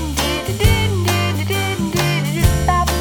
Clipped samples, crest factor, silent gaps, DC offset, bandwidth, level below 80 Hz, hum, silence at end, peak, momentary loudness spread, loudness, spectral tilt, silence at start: under 0.1%; 16 dB; none; under 0.1%; 19 kHz; -24 dBFS; none; 0 s; -2 dBFS; 4 LU; -17 LUFS; -4.5 dB/octave; 0 s